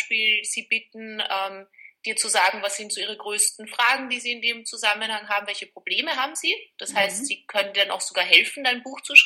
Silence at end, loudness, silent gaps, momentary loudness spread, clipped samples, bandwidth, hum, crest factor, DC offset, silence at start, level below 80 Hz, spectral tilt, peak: 0 s; -22 LUFS; none; 11 LU; under 0.1%; 16.5 kHz; none; 24 dB; under 0.1%; 0 s; -82 dBFS; 1 dB/octave; 0 dBFS